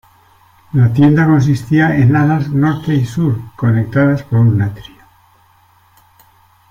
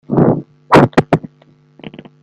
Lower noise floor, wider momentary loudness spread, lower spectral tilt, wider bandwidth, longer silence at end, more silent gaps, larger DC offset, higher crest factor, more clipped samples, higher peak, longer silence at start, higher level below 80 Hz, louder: about the same, -50 dBFS vs -49 dBFS; second, 7 LU vs 21 LU; about the same, -8.5 dB/octave vs -7.5 dB/octave; second, 7.6 kHz vs 12 kHz; first, 1.9 s vs 0.95 s; neither; neither; about the same, 12 dB vs 14 dB; second, under 0.1% vs 0.2%; about the same, -2 dBFS vs 0 dBFS; first, 0.75 s vs 0.1 s; about the same, -44 dBFS vs -44 dBFS; about the same, -13 LUFS vs -13 LUFS